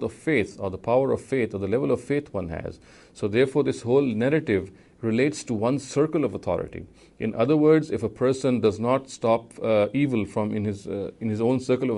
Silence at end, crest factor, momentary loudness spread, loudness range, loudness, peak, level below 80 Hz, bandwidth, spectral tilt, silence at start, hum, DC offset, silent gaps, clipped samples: 0 s; 16 dB; 10 LU; 3 LU; -25 LUFS; -8 dBFS; -56 dBFS; 11.5 kHz; -7 dB/octave; 0 s; none; under 0.1%; none; under 0.1%